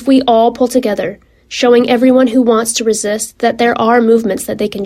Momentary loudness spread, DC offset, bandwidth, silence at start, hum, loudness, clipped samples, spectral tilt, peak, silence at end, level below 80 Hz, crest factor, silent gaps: 9 LU; under 0.1%; 15 kHz; 0 s; none; -12 LUFS; under 0.1%; -4 dB/octave; 0 dBFS; 0 s; -48 dBFS; 12 dB; none